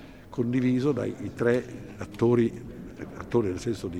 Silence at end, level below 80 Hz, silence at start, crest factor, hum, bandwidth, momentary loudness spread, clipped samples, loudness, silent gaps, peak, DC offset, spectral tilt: 0 s; -54 dBFS; 0 s; 18 dB; none; 12.5 kHz; 16 LU; under 0.1%; -27 LUFS; none; -10 dBFS; 0.1%; -7.5 dB/octave